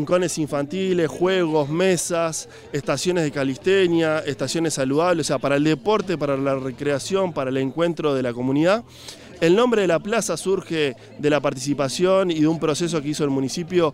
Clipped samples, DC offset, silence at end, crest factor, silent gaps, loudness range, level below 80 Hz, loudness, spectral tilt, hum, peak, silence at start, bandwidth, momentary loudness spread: under 0.1%; under 0.1%; 0 s; 14 dB; none; 1 LU; -56 dBFS; -21 LUFS; -5 dB/octave; none; -6 dBFS; 0 s; 16 kHz; 6 LU